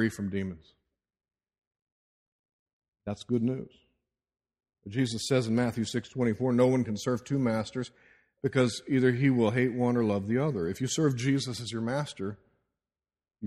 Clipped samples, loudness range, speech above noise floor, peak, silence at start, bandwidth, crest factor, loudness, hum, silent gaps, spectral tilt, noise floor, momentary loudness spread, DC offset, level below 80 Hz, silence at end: under 0.1%; 10 LU; over 62 dB; -10 dBFS; 0 s; 13 kHz; 20 dB; -29 LUFS; none; 1.58-1.71 s, 1.82-2.44 s, 2.53-2.66 s, 2.73-2.82 s, 2.88-2.92 s; -6 dB/octave; under -90 dBFS; 13 LU; under 0.1%; -64 dBFS; 0 s